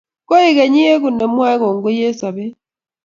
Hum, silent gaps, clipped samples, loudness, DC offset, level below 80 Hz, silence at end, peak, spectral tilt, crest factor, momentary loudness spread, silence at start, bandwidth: none; none; under 0.1%; -14 LUFS; under 0.1%; -62 dBFS; 0.5 s; 0 dBFS; -5.5 dB/octave; 14 dB; 12 LU; 0.3 s; 7.4 kHz